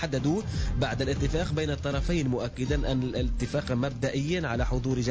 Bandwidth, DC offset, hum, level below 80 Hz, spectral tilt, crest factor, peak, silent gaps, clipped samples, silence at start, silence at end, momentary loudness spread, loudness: 8 kHz; 0.1%; none; -34 dBFS; -6 dB/octave; 12 dB; -16 dBFS; none; under 0.1%; 0 s; 0 s; 2 LU; -29 LUFS